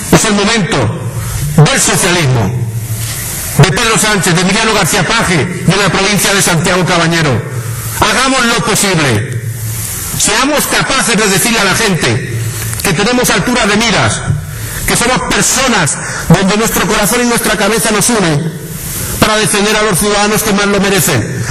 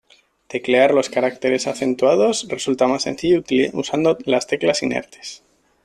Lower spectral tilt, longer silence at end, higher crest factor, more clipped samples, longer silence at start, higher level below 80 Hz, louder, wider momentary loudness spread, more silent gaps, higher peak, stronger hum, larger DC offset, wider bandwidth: about the same, -3.5 dB/octave vs -4 dB/octave; second, 0 s vs 0.5 s; second, 10 dB vs 16 dB; first, 0.1% vs under 0.1%; second, 0 s vs 0.5 s; first, -30 dBFS vs -58 dBFS; first, -10 LUFS vs -19 LUFS; about the same, 9 LU vs 11 LU; neither; about the same, 0 dBFS vs -2 dBFS; neither; neither; first, 14.5 kHz vs 12.5 kHz